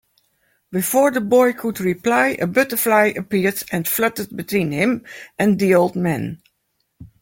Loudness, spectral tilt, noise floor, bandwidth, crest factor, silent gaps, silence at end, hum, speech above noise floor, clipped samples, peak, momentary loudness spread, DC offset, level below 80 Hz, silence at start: -18 LUFS; -5 dB/octave; -71 dBFS; 17 kHz; 16 dB; none; 0.15 s; none; 52 dB; under 0.1%; -2 dBFS; 10 LU; under 0.1%; -58 dBFS; 0.7 s